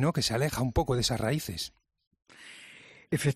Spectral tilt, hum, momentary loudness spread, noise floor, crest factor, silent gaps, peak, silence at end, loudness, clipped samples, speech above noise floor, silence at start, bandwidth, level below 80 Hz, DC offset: -5 dB/octave; none; 21 LU; -53 dBFS; 16 dB; 2.07-2.11 s; -14 dBFS; 0 s; -30 LUFS; under 0.1%; 24 dB; 0 s; 14 kHz; -46 dBFS; under 0.1%